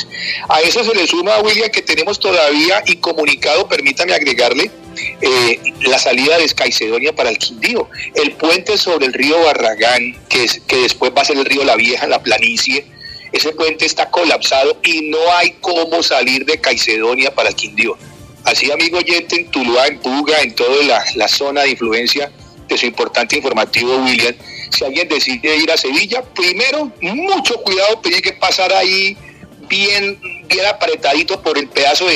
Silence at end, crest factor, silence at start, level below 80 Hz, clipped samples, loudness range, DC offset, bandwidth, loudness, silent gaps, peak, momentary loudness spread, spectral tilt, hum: 0 s; 14 dB; 0 s; -52 dBFS; under 0.1%; 2 LU; under 0.1%; 14.5 kHz; -13 LUFS; none; 0 dBFS; 6 LU; -1.5 dB/octave; none